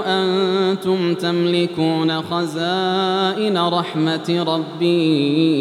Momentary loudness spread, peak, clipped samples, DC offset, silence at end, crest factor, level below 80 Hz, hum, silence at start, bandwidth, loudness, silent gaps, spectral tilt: 4 LU; -6 dBFS; under 0.1%; under 0.1%; 0 s; 12 dB; -70 dBFS; none; 0 s; 13 kHz; -18 LUFS; none; -6.5 dB/octave